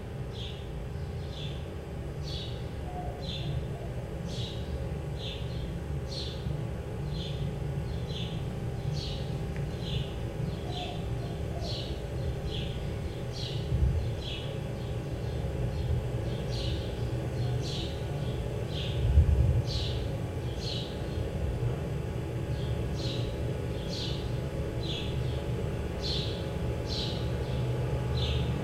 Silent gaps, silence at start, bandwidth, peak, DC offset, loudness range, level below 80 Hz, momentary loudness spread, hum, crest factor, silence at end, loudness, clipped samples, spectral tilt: none; 0 s; 14.5 kHz; -12 dBFS; under 0.1%; 6 LU; -38 dBFS; 7 LU; none; 20 dB; 0 s; -34 LUFS; under 0.1%; -6.5 dB/octave